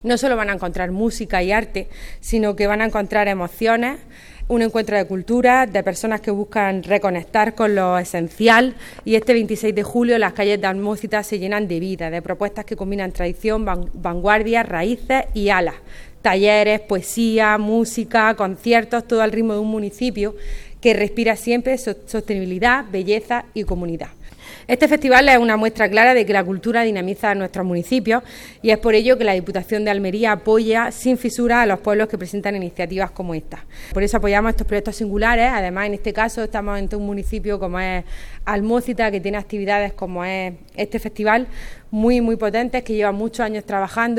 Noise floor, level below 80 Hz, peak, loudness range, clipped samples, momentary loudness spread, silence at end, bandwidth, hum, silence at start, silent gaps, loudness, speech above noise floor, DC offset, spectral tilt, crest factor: -38 dBFS; -34 dBFS; 0 dBFS; 6 LU; under 0.1%; 11 LU; 0 s; 16.5 kHz; none; 0 s; none; -19 LUFS; 19 dB; under 0.1%; -5 dB/octave; 18 dB